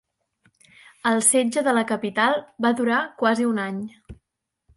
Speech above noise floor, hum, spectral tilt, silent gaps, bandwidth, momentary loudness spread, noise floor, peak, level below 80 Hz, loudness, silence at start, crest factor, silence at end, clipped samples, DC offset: 48 dB; none; -3 dB/octave; none; 12 kHz; 9 LU; -69 dBFS; -6 dBFS; -60 dBFS; -21 LUFS; 1.05 s; 18 dB; 0.65 s; under 0.1%; under 0.1%